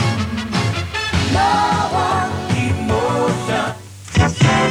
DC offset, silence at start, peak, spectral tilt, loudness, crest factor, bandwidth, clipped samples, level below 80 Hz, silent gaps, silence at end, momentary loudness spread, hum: under 0.1%; 0 s; -2 dBFS; -5 dB/octave; -18 LUFS; 16 dB; 14 kHz; under 0.1%; -34 dBFS; none; 0 s; 6 LU; none